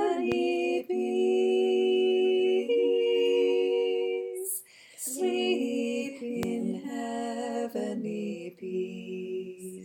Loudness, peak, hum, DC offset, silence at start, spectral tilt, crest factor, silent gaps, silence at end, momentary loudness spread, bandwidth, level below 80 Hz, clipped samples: -28 LUFS; -12 dBFS; none; under 0.1%; 0 s; -4 dB/octave; 16 dB; none; 0 s; 11 LU; 18 kHz; -72 dBFS; under 0.1%